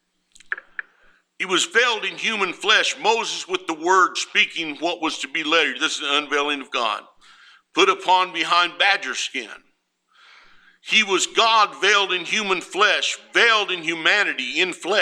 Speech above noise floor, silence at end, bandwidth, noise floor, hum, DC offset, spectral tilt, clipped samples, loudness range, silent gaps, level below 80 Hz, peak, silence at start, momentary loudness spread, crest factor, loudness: 44 dB; 0 s; 14 kHz; -65 dBFS; none; under 0.1%; -1 dB/octave; under 0.1%; 3 LU; none; -72 dBFS; -2 dBFS; 0.5 s; 9 LU; 20 dB; -19 LUFS